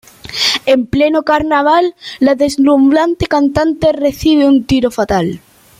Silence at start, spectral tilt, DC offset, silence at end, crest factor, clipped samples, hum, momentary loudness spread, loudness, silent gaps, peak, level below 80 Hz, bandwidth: 0.25 s; -5 dB/octave; under 0.1%; 0.45 s; 12 dB; under 0.1%; none; 5 LU; -12 LUFS; none; 0 dBFS; -38 dBFS; 15.5 kHz